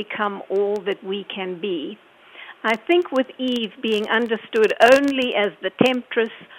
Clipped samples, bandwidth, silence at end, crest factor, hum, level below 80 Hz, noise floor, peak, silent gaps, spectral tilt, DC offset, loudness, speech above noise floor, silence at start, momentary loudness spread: under 0.1%; 16.5 kHz; 0 s; 20 dB; none; -66 dBFS; -43 dBFS; 0 dBFS; none; -4.5 dB/octave; under 0.1%; -21 LUFS; 22 dB; 0 s; 12 LU